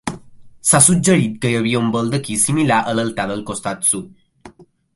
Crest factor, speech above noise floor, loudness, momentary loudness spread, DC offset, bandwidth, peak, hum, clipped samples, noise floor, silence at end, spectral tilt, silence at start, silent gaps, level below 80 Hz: 18 dB; 27 dB; -16 LUFS; 13 LU; under 0.1%; 12 kHz; 0 dBFS; none; under 0.1%; -44 dBFS; 0.3 s; -4 dB/octave; 0.05 s; none; -50 dBFS